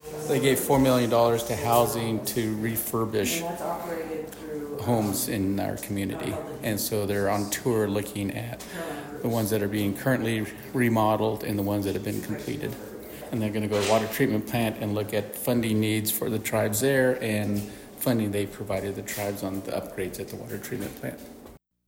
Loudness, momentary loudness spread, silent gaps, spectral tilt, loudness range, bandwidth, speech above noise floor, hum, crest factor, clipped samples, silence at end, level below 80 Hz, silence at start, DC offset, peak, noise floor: -27 LUFS; 12 LU; none; -5 dB/octave; 4 LU; 17 kHz; 23 dB; none; 18 dB; under 0.1%; 0.3 s; -54 dBFS; 0.05 s; under 0.1%; -8 dBFS; -50 dBFS